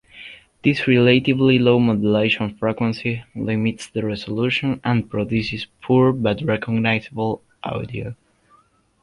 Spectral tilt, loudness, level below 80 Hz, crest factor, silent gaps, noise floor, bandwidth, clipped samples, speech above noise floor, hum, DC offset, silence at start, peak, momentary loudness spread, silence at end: -7 dB/octave; -20 LUFS; -50 dBFS; 18 dB; none; -57 dBFS; 11 kHz; under 0.1%; 38 dB; none; under 0.1%; 0.15 s; -2 dBFS; 14 LU; 0.9 s